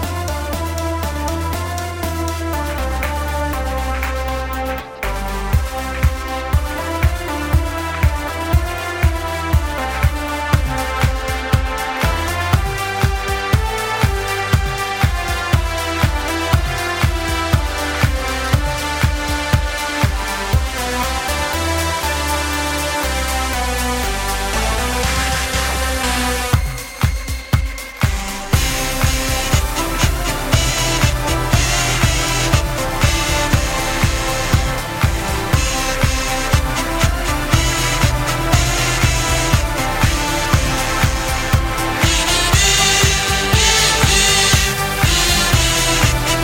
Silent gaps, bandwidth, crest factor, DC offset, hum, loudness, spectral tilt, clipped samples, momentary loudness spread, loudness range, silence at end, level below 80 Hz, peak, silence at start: none; 17 kHz; 16 dB; under 0.1%; none; -17 LUFS; -3.5 dB/octave; under 0.1%; 8 LU; 8 LU; 0 s; -22 dBFS; 0 dBFS; 0 s